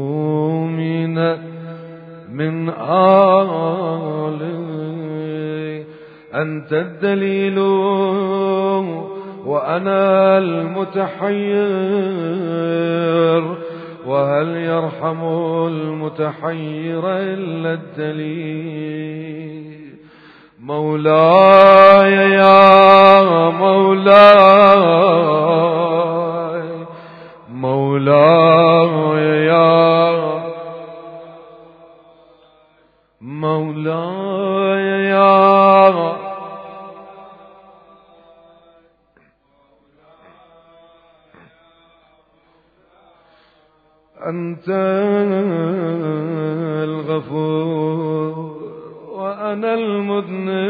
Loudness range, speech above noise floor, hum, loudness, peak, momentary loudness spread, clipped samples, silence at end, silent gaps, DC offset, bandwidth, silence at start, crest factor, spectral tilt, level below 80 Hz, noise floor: 15 LU; 44 dB; none; -14 LUFS; 0 dBFS; 20 LU; 0.1%; 0 s; none; under 0.1%; 5.4 kHz; 0 s; 16 dB; -9 dB/octave; -66 dBFS; -57 dBFS